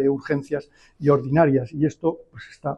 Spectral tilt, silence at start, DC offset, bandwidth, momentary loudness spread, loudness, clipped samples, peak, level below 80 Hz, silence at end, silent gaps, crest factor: -9 dB/octave; 0 s; under 0.1%; 8.6 kHz; 13 LU; -22 LUFS; under 0.1%; -6 dBFS; -54 dBFS; 0 s; none; 16 dB